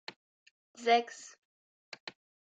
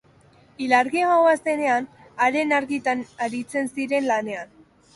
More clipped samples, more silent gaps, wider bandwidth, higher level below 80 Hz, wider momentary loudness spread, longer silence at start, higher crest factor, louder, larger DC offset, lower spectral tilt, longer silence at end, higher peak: neither; first, 1.38-1.92 s, 2.00-2.07 s vs none; second, 9.2 kHz vs 11.5 kHz; second, under -90 dBFS vs -66 dBFS; first, 22 LU vs 13 LU; first, 0.8 s vs 0.6 s; first, 24 dB vs 18 dB; second, -30 LUFS vs -22 LUFS; neither; second, -1.5 dB/octave vs -4 dB/octave; about the same, 0.4 s vs 0.5 s; second, -14 dBFS vs -4 dBFS